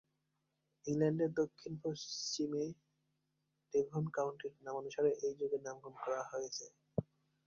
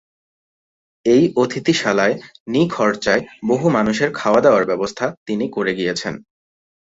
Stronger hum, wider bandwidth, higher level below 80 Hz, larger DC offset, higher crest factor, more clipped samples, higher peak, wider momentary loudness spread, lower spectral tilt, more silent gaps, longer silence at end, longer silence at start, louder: neither; about the same, 7.4 kHz vs 8 kHz; second, -76 dBFS vs -56 dBFS; neither; about the same, 18 dB vs 16 dB; neither; second, -22 dBFS vs -2 dBFS; about the same, 10 LU vs 9 LU; about the same, -5.5 dB/octave vs -5.5 dB/octave; second, none vs 2.40-2.46 s, 5.17-5.26 s; second, 0.45 s vs 0.65 s; second, 0.85 s vs 1.05 s; second, -40 LUFS vs -18 LUFS